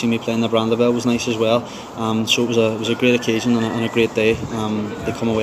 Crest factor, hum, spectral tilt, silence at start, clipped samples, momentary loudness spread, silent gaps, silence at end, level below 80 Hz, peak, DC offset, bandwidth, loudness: 16 dB; none; -5 dB/octave; 0 s; under 0.1%; 6 LU; none; 0 s; -50 dBFS; -2 dBFS; under 0.1%; 15 kHz; -19 LUFS